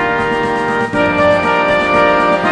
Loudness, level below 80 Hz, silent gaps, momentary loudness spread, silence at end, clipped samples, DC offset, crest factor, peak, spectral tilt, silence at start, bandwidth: -13 LUFS; -40 dBFS; none; 4 LU; 0 s; under 0.1%; under 0.1%; 12 dB; 0 dBFS; -5.5 dB/octave; 0 s; 10.5 kHz